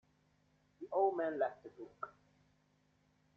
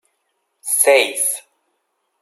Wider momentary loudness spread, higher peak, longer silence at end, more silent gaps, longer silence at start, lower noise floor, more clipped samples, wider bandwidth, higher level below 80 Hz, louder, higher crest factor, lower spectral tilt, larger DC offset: first, 19 LU vs 16 LU; second, -22 dBFS vs 0 dBFS; first, 1.25 s vs 0.8 s; neither; first, 0.8 s vs 0.65 s; first, -75 dBFS vs -71 dBFS; neither; second, 6.2 kHz vs 15.5 kHz; about the same, -84 dBFS vs -82 dBFS; second, -37 LUFS vs -15 LUFS; about the same, 20 dB vs 20 dB; first, -7.5 dB/octave vs 2 dB/octave; neither